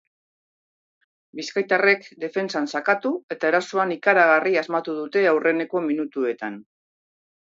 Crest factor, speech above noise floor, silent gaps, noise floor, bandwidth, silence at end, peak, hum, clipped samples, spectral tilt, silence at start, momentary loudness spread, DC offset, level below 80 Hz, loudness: 20 dB; over 68 dB; 3.23-3.29 s; under -90 dBFS; 7.8 kHz; 0.85 s; -4 dBFS; none; under 0.1%; -5 dB/octave; 1.35 s; 11 LU; under 0.1%; -80 dBFS; -22 LUFS